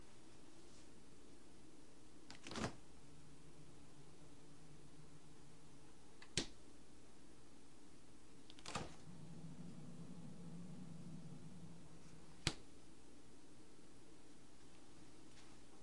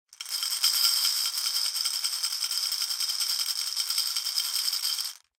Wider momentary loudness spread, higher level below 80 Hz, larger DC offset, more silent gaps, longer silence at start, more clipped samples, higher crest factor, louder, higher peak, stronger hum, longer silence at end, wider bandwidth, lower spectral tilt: first, 18 LU vs 6 LU; first, -70 dBFS vs -80 dBFS; first, 0.3% vs under 0.1%; neither; about the same, 0 s vs 0.1 s; neither; first, 38 dB vs 20 dB; second, -55 LUFS vs -25 LUFS; second, -18 dBFS vs -10 dBFS; neither; second, 0 s vs 0.2 s; second, 11.5 kHz vs 17 kHz; first, -3.5 dB/octave vs 6 dB/octave